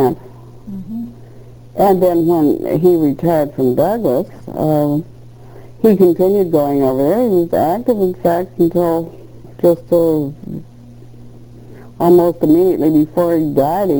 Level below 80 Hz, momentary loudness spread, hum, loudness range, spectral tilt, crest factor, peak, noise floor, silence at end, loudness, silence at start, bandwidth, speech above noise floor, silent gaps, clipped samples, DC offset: -46 dBFS; 15 LU; none; 3 LU; -8.5 dB/octave; 14 dB; 0 dBFS; -37 dBFS; 0 s; -14 LUFS; 0 s; over 20 kHz; 24 dB; none; under 0.1%; under 0.1%